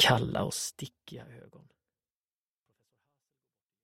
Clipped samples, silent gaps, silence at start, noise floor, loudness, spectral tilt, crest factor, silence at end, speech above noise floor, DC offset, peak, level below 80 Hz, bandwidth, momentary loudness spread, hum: under 0.1%; none; 0 s; under -90 dBFS; -30 LUFS; -3 dB/octave; 24 dB; 2.45 s; over 57 dB; under 0.1%; -10 dBFS; -62 dBFS; 16 kHz; 22 LU; none